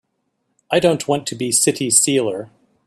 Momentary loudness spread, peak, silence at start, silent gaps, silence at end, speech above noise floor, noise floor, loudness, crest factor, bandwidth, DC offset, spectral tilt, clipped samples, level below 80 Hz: 8 LU; 0 dBFS; 0.7 s; none; 0.4 s; 53 dB; -71 dBFS; -17 LUFS; 20 dB; 16 kHz; under 0.1%; -3 dB/octave; under 0.1%; -60 dBFS